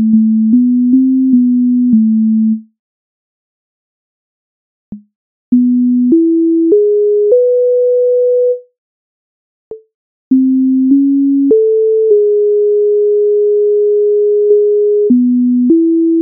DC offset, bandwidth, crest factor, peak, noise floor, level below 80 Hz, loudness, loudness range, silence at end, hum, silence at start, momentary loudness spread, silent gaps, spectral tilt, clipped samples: under 0.1%; 0.8 kHz; 10 dB; 0 dBFS; under -90 dBFS; -62 dBFS; -10 LUFS; 6 LU; 0 s; none; 0 s; 1 LU; 2.79-4.92 s, 5.15-5.52 s, 8.78-9.71 s, 9.94-10.31 s; -11.5 dB/octave; under 0.1%